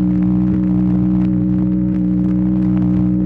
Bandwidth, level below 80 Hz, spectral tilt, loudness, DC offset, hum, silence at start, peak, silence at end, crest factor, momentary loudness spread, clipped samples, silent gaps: 3 kHz; -30 dBFS; -12 dB/octave; -16 LUFS; under 0.1%; none; 0 s; -8 dBFS; 0 s; 6 dB; 1 LU; under 0.1%; none